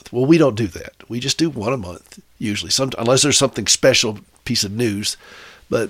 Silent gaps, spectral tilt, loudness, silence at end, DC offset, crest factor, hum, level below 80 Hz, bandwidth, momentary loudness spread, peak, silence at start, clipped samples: none; -3.5 dB/octave; -17 LUFS; 0 s; under 0.1%; 18 dB; none; -50 dBFS; 16 kHz; 15 LU; -2 dBFS; 0.05 s; under 0.1%